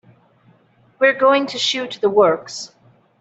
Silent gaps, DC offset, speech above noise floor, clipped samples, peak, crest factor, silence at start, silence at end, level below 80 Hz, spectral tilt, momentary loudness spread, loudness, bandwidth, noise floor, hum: none; under 0.1%; 38 dB; under 0.1%; -2 dBFS; 16 dB; 1 s; 0.55 s; -66 dBFS; -3 dB/octave; 16 LU; -17 LUFS; 8.2 kHz; -55 dBFS; none